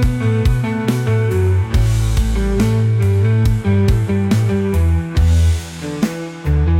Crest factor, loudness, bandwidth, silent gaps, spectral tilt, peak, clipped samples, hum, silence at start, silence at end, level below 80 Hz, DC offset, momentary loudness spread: 10 dB; -16 LUFS; 16 kHz; none; -7.5 dB/octave; -4 dBFS; under 0.1%; none; 0 s; 0 s; -22 dBFS; under 0.1%; 6 LU